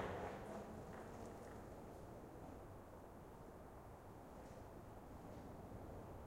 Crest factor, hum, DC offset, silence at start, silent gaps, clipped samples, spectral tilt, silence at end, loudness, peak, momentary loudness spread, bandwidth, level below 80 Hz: 20 dB; none; under 0.1%; 0 s; none; under 0.1%; -6.5 dB/octave; 0 s; -56 LUFS; -34 dBFS; 7 LU; 16 kHz; -64 dBFS